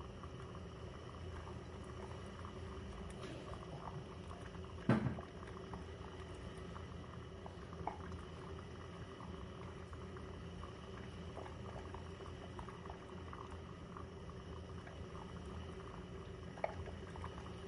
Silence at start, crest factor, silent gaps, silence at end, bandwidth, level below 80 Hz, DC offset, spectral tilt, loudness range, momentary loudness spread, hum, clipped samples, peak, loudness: 0 s; 26 dB; none; 0 s; 11 kHz; -58 dBFS; under 0.1%; -6.5 dB/octave; 6 LU; 6 LU; none; under 0.1%; -22 dBFS; -49 LUFS